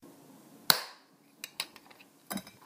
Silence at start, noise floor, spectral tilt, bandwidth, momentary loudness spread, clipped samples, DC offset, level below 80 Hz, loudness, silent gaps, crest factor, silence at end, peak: 0.05 s; -61 dBFS; -1 dB/octave; 16 kHz; 20 LU; under 0.1%; under 0.1%; -80 dBFS; -32 LUFS; none; 36 dB; 0.15 s; -2 dBFS